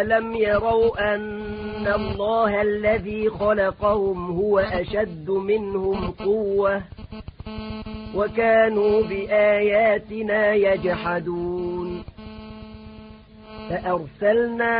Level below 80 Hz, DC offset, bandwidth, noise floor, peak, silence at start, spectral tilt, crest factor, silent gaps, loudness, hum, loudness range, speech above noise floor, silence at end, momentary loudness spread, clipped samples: -44 dBFS; under 0.1%; 5 kHz; -44 dBFS; -8 dBFS; 0 s; -10.5 dB/octave; 16 dB; none; -22 LUFS; none; 6 LU; 22 dB; 0 s; 19 LU; under 0.1%